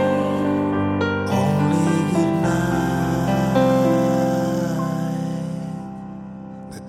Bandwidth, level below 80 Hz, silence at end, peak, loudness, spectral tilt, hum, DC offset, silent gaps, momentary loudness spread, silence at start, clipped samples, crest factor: 15.5 kHz; -44 dBFS; 0 s; -4 dBFS; -20 LUFS; -7 dB/octave; none; under 0.1%; none; 15 LU; 0 s; under 0.1%; 16 dB